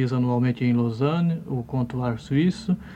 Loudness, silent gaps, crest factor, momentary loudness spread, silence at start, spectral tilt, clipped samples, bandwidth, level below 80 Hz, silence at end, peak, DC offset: -24 LUFS; none; 14 dB; 6 LU; 0 s; -8.5 dB/octave; under 0.1%; 9 kHz; -52 dBFS; 0 s; -8 dBFS; under 0.1%